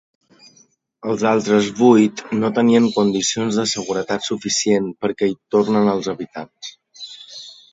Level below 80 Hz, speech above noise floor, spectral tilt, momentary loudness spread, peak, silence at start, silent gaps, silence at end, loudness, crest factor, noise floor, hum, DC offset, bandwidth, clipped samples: -62 dBFS; 38 dB; -4.5 dB/octave; 20 LU; 0 dBFS; 1.05 s; none; 0.2 s; -18 LUFS; 18 dB; -56 dBFS; none; under 0.1%; 8 kHz; under 0.1%